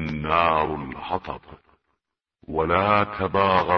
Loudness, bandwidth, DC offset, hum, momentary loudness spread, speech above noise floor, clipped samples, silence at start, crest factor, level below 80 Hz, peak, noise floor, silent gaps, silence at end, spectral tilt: -23 LUFS; 6.4 kHz; under 0.1%; none; 12 LU; 57 dB; under 0.1%; 0 s; 20 dB; -46 dBFS; -2 dBFS; -80 dBFS; none; 0 s; -8 dB/octave